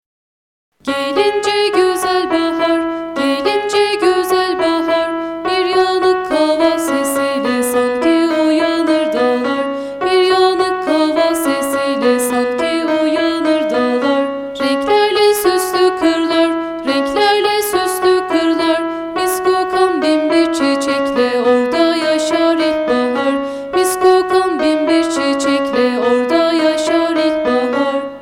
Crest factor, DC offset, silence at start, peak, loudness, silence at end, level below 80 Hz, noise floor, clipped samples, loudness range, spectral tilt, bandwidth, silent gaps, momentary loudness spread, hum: 14 dB; under 0.1%; 0.85 s; 0 dBFS; -14 LUFS; 0 s; -50 dBFS; under -90 dBFS; under 0.1%; 1 LU; -3 dB/octave; 17 kHz; none; 5 LU; 50 Hz at -55 dBFS